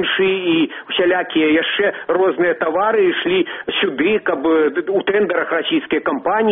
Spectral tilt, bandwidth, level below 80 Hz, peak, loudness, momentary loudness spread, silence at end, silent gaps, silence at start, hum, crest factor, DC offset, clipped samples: -2 dB/octave; 3.9 kHz; -58 dBFS; -4 dBFS; -17 LUFS; 4 LU; 0 s; none; 0 s; none; 12 dB; under 0.1%; under 0.1%